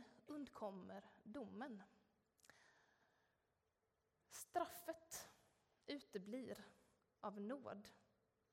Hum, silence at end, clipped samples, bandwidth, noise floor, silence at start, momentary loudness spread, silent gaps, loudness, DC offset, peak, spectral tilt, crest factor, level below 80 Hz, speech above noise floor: none; 0.55 s; under 0.1%; 16 kHz; -88 dBFS; 0 s; 12 LU; none; -53 LUFS; under 0.1%; -30 dBFS; -4 dB/octave; 24 dB; -90 dBFS; 36 dB